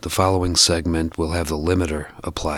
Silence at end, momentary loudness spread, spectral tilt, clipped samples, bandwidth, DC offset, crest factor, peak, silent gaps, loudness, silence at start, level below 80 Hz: 0 s; 12 LU; -4 dB/octave; under 0.1%; 17 kHz; under 0.1%; 18 dB; -2 dBFS; none; -20 LUFS; 0.05 s; -34 dBFS